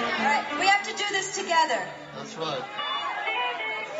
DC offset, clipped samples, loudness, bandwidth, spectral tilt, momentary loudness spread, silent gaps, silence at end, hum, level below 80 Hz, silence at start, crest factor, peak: under 0.1%; under 0.1%; -26 LUFS; 8.2 kHz; -1.5 dB/octave; 10 LU; none; 0 s; none; -72 dBFS; 0 s; 18 dB; -10 dBFS